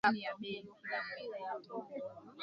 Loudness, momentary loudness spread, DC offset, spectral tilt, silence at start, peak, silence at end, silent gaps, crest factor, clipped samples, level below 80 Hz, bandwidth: -42 LUFS; 7 LU; under 0.1%; -2 dB/octave; 0.05 s; -16 dBFS; 0 s; none; 24 dB; under 0.1%; -80 dBFS; 7.2 kHz